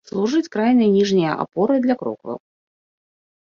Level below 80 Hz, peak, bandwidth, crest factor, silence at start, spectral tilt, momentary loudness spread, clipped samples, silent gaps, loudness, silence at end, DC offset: -62 dBFS; -4 dBFS; 7.2 kHz; 16 dB; 0.15 s; -6.5 dB/octave; 15 LU; under 0.1%; none; -19 LUFS; 1.05 s; under 0.1%